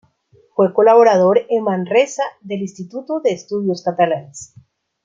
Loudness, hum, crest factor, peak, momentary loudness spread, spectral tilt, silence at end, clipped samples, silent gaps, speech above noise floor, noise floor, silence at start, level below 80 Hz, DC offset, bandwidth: -16 LUFS; none; 16 dB; -2 dBFS; 15 LU; -5.5 dB/octave; 0.6 s; under 0.1%; none; 39 dB; -55 dBFS; 0.6 s; -66 dBFS; under 0.1%; 7.8 kHz